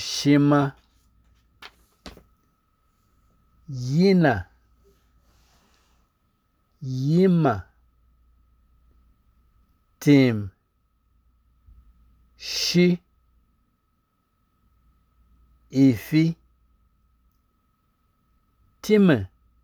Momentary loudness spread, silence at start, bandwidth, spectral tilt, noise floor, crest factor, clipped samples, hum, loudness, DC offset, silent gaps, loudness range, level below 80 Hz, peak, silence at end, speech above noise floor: 20 LU; 0 s; 20 kHz; -6.5 dB/octave; -70 dBFS; 20 dB; under 0.1%; none; -21 LUFS; under 0.1%; none; 2 LU; -58 dBFS; -6 dBFS; 0.4 s; 51 dB